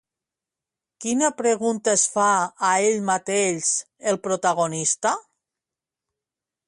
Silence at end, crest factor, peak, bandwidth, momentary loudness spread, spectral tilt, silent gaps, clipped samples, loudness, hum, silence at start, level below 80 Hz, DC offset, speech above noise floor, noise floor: 1.5 s; 18 dB; -6 dBFS; 11.5 kHz; 6 LU; -3 dB/octave; none; under 0.1%; -22 LUFS; none; 1 s; -72 dBFS; under 0.1%; 67 dB; -88 dBFS